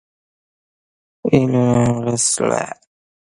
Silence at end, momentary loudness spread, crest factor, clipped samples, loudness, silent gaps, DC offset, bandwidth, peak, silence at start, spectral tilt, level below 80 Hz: 0.5 s; 12 LU; 18 dB; under 0.1%; -17 LUFS; none; under 0.1%; 11.5 kHz; 0 dBFS; 1.25 s; -5 dB/octave; -48 dBFS